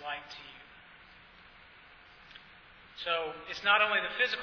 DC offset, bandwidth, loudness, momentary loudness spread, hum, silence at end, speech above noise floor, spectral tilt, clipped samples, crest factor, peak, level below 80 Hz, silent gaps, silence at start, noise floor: under 0.1%; 5.4 kHz; -30 LUFS; 26 LU; none; 0 s; 26 dB; -2.5 dB/octave; under 0.1%; 22 dB; -14 dBFS; -68 dBFS; none; 0 s; -56 dBFS